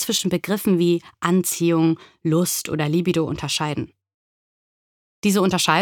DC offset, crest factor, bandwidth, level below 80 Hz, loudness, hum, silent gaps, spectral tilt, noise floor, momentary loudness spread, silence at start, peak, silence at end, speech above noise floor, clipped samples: under 0.1%; 18 dB; 19 kHz; -56 dBFS; -21 LUFS; none; 4.14-5.22 s; -4.5 dB/octave; under -90 dBFS; 6 LU; 0 s; -4 dBFS; 0 s; over 70 dB; under 0.1%